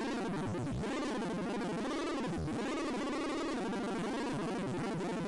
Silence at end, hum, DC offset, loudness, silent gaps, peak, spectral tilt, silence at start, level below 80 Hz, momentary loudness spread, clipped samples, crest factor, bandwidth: 0 s; none; under 0.1%; -37 LUFS; none; -32 dBFS; -5.5 dB/octave; 0 s; -56 dBFS; 1 LU; under 0.1%; 4 dB; 11.5 kHz